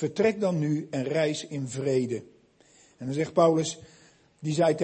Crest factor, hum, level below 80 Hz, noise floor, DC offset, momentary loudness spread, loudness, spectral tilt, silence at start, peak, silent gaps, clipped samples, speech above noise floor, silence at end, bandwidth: 18 dB; none; -68 dBFS; -59 dBFS; under 0.1%; 12 LU; -27 LUFS; -6 dB/octave; 0 s; -10 dBFS; none; under 0.1%; 33 dB; 0 s; 8.8 kHz